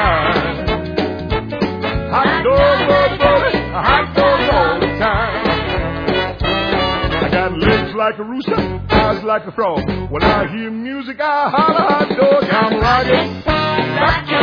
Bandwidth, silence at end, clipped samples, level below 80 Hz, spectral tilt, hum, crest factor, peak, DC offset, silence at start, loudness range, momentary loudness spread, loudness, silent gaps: 5.4 kHz; 0 s; under 0.1%; -30 dBFS; -7 dB/octave; none; 16 dB; 0 dBFS; under 0.1%; 0 s; 3 LU; 8 LU; -15 LUFS; none